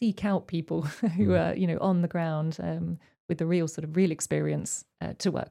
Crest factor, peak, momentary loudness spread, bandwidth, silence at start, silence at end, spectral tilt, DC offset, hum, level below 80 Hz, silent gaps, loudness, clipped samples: 14 dB; -14 dBFS; 9 LU; 13 kHz; 0 s; 0.05 s; -6.5 dB/octave; under 0.1%; none; -62 dBFS; 3.20-3.29 s; -29 LUFS; under 0.1%